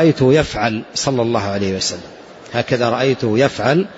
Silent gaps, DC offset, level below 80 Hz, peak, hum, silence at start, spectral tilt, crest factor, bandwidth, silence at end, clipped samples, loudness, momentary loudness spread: none; under 0.1%; -44 dBFS; -2 dBFS; none; 0 s; -5 dB/octave; 14 dB; 8 kHz; 0 s; under 0.1%; -17 LUFS; 8 LU